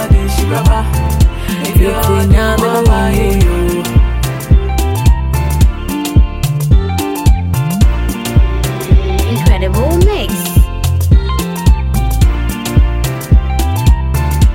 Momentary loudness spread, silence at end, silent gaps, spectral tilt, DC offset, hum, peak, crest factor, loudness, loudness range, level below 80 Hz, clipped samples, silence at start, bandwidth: 4 LU; 0 s; none; -6 dB/octave; under 0.1%; none; 0 dBFS; 10 dB; -13 LUFS; 2 LU; -12 dBFS; under 0.1%; 0 s; 17 kHz